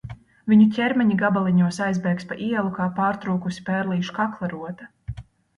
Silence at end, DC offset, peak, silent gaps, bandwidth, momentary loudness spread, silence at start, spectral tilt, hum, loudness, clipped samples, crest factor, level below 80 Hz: 0.35 s; under 0.1%; -6 dBFS; none; 11 kHz; 20 LU; 0.05 s; -7.5 dB/octave; none; -22 LUFS; under 0.1%; 16 dB; -52 dBFS